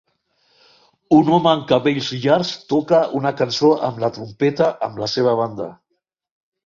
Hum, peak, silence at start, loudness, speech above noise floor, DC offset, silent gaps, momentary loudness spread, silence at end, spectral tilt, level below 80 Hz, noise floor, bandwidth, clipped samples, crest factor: none; -2 dBFS; 1.1 s; -18 LUFS; 56 dB; under 0.1%; none; 9 LU; 0.95 s; -6 dB/octave; -60 dBFS; -74 dBFS; 7.4 kHz; under 0.1%; 18 dB